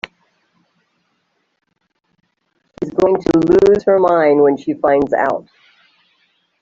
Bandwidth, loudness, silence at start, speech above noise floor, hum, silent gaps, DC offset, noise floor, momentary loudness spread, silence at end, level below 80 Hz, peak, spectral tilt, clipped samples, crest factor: 7.6 kHz; -14 LUFS; 2.8 s; 54 dB; none; none; under 0.1%; -67 dBFS; 12 LU; 1.2 s; -48 dBFS; -2 dBFS; -7.5 dB/octave; under 0.1%; 16 dB